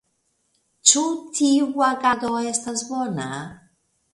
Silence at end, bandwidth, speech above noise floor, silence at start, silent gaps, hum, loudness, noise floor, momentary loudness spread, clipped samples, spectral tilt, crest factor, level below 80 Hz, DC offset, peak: 0.55 s; 11.5 kHz; 48 dB; 0.85 s; none; none; -21 LUFS; -70 dBFS; 13 LU; under 0.1%; -2 dB/octave; 22 dB; -64 dBFS; under 0.1%; 0 dBFS